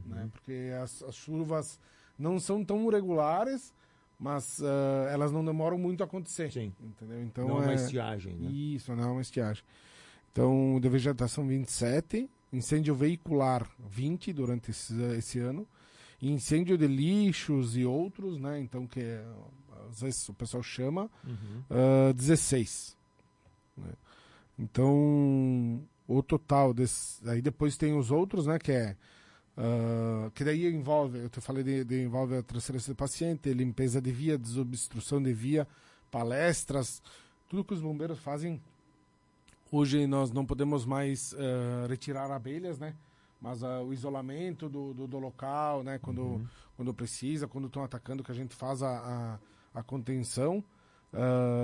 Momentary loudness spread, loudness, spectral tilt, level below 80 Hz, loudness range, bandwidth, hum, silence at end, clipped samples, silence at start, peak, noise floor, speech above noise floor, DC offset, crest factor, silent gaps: 14 LU; -32 LUFS; -6.5 dB/octave; -58 dBFS; 8 LU; 11.5 kHz; none; 0 s; under 0.1%; 0 s; -14 dBFS; -67 dBFS; 36 dB; under 0.1%; 18 dB; none